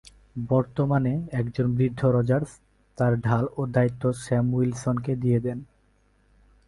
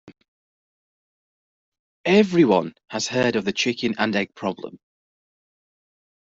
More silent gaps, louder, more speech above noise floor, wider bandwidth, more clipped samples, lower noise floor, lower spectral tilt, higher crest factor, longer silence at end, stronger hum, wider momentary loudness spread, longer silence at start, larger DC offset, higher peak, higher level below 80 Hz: second, none vs 0.28-1.72 s, 1.79-2.04 s; second, -25 LUFS vs -21 LUFS; second, 39 dB vs over 69 dB; first, 11.5 kHz vs 8 kHz; neither; second, -63 dBFS vs under -90 dBFS; first, -8.5 dB/octave vs -5 dB/octave; about the same, 18 dB vs 20 dB; second, 1.05 s vs 1.6 s; neither; second, 6 LU vs 12 LU; first, 0.35 s vs 0.05 s; neither; second, -8 dBFS vs -4 dBFS; first, -52 dBFS vs -64 dBFS